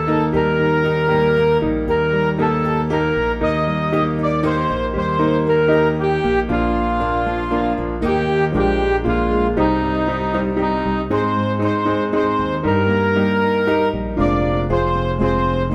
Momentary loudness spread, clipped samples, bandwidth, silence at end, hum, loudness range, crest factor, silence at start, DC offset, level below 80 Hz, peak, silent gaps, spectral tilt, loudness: 4 LU; under 0.1%; 8.4 kHz; 0 s; none; 1 LU; 14 dB; 0 s; under 0.1%; -30 dBFS; -4 dBFS; none; -8.5 dB/octave; -18 LUFS